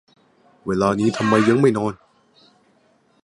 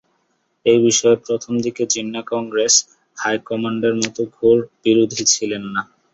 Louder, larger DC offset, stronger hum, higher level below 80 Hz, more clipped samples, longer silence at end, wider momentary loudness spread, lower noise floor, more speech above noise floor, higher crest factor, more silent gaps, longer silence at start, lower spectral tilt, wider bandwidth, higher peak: about the same, -19 LUFS vs -18 LUFS; neither; neither; first, -54 dBFS vs -60 dBFS; neither; first, 1.3 s vs 0.3 s; about the same, 11 LU vs 10 LU; second, -60 dBFS vs -67 dBFS; second, 42 dB vs 49 dB; about the same, 20 dB vs 18 dB; neither; about the same, 0.65 s vs 0.65 s; first, -6.5 dB/octave vs -3 dB/octave; first, 11.5 kHz vs 8.2 kHz; about the same, -2 dBFS vs 0 dBFS